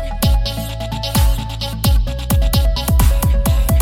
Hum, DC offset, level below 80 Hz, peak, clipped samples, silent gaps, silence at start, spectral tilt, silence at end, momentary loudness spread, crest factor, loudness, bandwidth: none; under 0.1%; -16 dBFS; -2 dBFS; under 0.1%; none; 0 s; -5 dB/octave; 0 s; 8 LU; 14 dB; -17 LUFS; 17 kHz